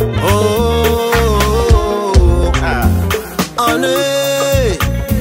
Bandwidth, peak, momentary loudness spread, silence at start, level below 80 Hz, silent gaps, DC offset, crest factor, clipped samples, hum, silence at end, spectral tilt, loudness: 16.5 kHz; 0 dBFS; 4 LU; 0 s; -18 dBFS; none; under 0.1%; 12 dB; under 0.1%; none; 0 s; -5 dB/octave; -13 LUFS